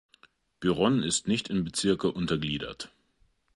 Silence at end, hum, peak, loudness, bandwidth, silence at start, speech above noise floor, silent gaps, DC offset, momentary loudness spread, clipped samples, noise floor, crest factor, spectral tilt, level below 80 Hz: 0.7 s; none; -12 dBFS; -28 LUFS; 11.5 kHz; 0.6 s; 40 dB; none; under 0.1%; 11 LU; under 0.1%; -68 dBFS; 18 dB; -4.5 dB/octave; -56 dBFS